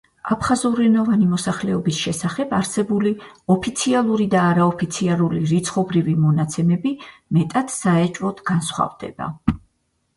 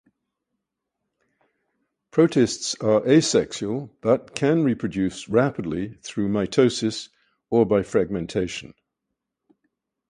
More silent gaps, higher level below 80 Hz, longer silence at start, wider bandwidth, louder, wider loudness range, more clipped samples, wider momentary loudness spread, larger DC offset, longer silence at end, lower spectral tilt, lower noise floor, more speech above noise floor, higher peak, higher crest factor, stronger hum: neither; first, -48 dBFS vs -54 dBFS; second, 0.25 s vs 2.15 s; about the same, 11.5 kHz vs 11 kHz; about the same, -20 LUFS vs -22 LUFS; about the same, 3 LU vs 4 LU; neither; second, 8 LU vs 11 LU; neither; second, 0.6 s vs 1.45 s; about the same, -6 dB/octave vs -5.5 dB/octave; second, -69 dBFS vs -82 dBFS; second, 49 dB vs 60 dB; about the same, -2 dBFS vs -4 dBFS; about the same, 18 dB vs 20 dB; neither